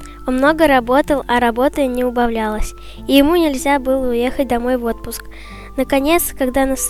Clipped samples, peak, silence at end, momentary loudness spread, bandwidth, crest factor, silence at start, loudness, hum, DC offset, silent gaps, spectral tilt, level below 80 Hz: under 0.1%; 0 dBFS; 0 s; 15 LU; 16.5 kHz; 16 dB; 0 s; -16 LUFS; none; under 0.1%; none; -4 dB/octave; -32 dBFS